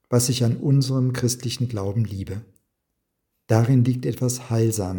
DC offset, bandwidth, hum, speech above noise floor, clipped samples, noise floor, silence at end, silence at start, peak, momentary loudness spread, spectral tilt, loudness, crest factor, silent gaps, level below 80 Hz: under 0.1%; 18 kHz; none; 56 dB; under 0.1%; -77 dBFS; 0 s; 0.1 s; -2 dBFS; 8 LU; -6 dB/octave; -22 LUFS; 20 dB; none; -58 dBFS